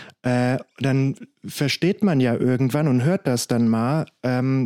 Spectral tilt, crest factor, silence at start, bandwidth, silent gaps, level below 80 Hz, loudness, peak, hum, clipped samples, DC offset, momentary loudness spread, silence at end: -6.5 dB/octave; 12 dB; 0 s; 16 kHz; none; -62 dBFS; -21 LUFS; -8 dBFS; none; under 0.1%; under 0.1%; 5 LU; 0 s